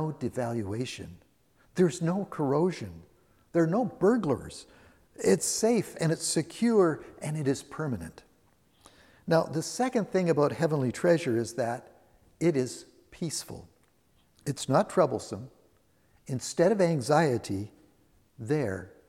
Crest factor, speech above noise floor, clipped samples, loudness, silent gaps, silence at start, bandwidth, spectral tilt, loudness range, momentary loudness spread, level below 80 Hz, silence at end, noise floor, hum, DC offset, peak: 20 dB; 39 dB; under 0.1%; -28 LUFS; none; 0 s; 16 kHz; -5.5 dB/octave; 4 LU; 15 LU; -64 dBFS; 0.2 s; -67 dBFS; none; under 0.1%; -10 dBFS